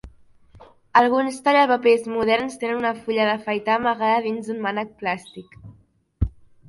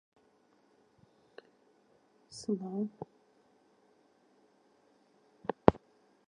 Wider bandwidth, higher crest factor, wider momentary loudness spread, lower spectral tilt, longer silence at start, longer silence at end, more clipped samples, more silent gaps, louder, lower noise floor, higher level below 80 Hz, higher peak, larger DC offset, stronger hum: first, 11.5 kHz vs 10 kHz; second, 20 dB vs 38 dB; second, 12 LU vs 29 LU; second, -5.5 dB/octave vs -7 dB/octave; second, 0.05 s vs 2.3 s; second, 0.4 s vs 0.55 s; neither; neither; first, -21 LUFS vs -33 LUFS; second, -56 dBFS vs -69 dBFS; first, -42 dBFS vs -58 dBFS; about the same, -2 dBFS vs -2 dBFS; neither; neither